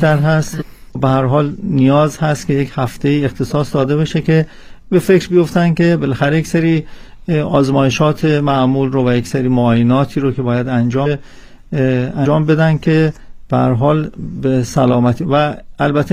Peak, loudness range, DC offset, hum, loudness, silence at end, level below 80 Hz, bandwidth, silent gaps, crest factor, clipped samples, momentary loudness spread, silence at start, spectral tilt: 0 dBFS; 2 LU; under 0.1%; none; -14 LUFS; 0 s; -38 dBFS; 15 kHz; none; 14 dB; under 0.1%; 7 LU; 0 s; -7.5 dB/octave